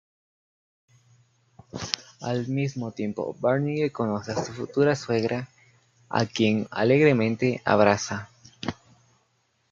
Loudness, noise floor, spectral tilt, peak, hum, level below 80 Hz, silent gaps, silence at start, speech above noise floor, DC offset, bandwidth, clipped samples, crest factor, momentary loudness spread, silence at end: -25 LUFS; -70 dBFS; -6 dB/octave; -2 dBFS; none; -64 dBFS; none; 1.75 s; 45 dB; under 0.1%; 7.6 kHz; under 0.1%; 26 dB; 15 LU; 1 s